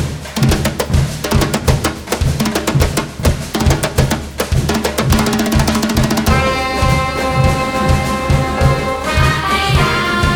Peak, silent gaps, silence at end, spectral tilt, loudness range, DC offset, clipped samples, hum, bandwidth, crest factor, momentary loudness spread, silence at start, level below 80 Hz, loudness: 0 dBFS; none; 0 s; -5 dB/octave; 2 LU; under 0.1%; under 0.1%; none; over 20 kHz; 14 dB; 4 LU; 0 s; -22 dBFS; -15 LUFS